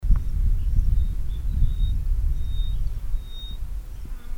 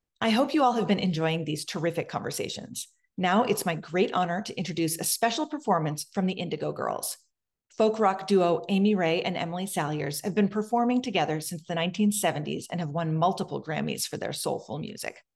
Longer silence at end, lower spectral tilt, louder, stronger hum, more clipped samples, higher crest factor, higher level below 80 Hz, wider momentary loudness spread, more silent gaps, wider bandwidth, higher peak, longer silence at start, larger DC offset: second, 0 s vs 0.15 s; first, -7 dB/octave vs -4.5 dB/octave; about the same, -29 LUFS vs -28 LUFS; neither; neither; about the same, 16 dB vs 18 dB; first, -22 dBFS vs -70 dBFS; first, 12 LU vs 9 LU; neither; second, 4 kHz vs 16 kHz; first, -6 dBFS vs -10 dBFS; second, 0 s vs 0.2 s; neither